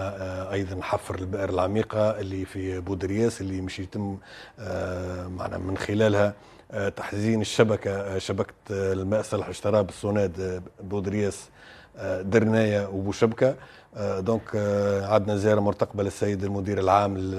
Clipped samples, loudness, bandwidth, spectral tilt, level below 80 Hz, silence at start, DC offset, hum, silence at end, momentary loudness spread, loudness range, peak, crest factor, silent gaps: under 0.1%; -26 LUFS; 13 kHz; -6.5 dB/octave; -56 dBFS; 0 s; under 0.1%; none; 0 s; 11 LU; 4 LU; -4 dBFS; 22 dB; none